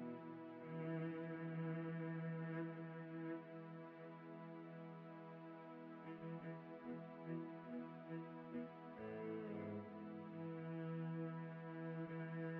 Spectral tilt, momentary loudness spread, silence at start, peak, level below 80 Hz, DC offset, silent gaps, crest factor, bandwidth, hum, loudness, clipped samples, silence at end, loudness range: -8 dB/octave; 9 LU; 0 s; -36 dBFS; under -90 dBFS; under 0.1%; none; 14 dB; 4.5 kHz; none; -51 LUFS; under 0.1%; 0 s; 6 LU